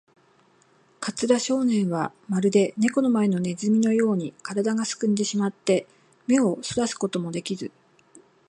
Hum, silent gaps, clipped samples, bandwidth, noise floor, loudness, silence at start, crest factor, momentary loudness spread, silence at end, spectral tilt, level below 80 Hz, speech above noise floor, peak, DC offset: none; none; under 0.1%; 11 kHz; -60 dBFS; -24 LUFS; 1 s; 18 dB; 9 LU; 0.8 s; -5.5 dB/octave; -68 dBFS; 37 dB; -6 dBFS; under 0.1%